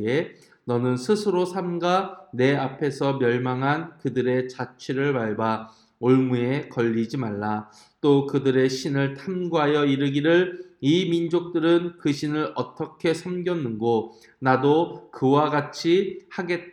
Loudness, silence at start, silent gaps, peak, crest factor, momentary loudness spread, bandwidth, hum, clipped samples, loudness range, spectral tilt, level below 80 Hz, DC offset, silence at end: -24 LUFS; 0 s; none; -4 dBFS; 18 dB; 8 LU; 11.5 kHz; none; under 0.1%; 3 LU; -6.5 dB/octave; -70 dBFS; under 0.1%; 0 s